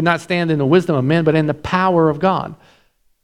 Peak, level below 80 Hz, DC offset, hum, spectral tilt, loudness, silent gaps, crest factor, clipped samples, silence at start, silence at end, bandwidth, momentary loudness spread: 0 dBFS; -48 dBFS; under 0.1%; none; -7.5 dB/octave; -16 LUFS; none; 16 dB; under 0.1%; 0 s; 0.7 s; 11.5 kHz; 4 LU